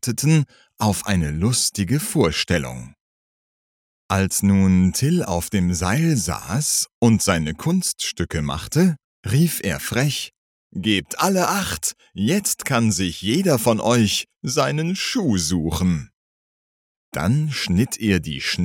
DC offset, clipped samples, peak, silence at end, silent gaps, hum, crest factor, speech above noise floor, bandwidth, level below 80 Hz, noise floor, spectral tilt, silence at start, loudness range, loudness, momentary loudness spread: under 0.1%; under 0.1%; -2 dBFS; 0 s; 3.01-4.09 s, 6.94-7.02 s, 9.04-9.23 s, 10.37-10.70 s, 16.14-17.12 s; none; 18 dB; over 70 dB; 18.5 kHz; -42 dBFS; under -90 dBFS; -4.5 dB/octave; 0.05 s; 3 LU; -20 LUFS; 7 LU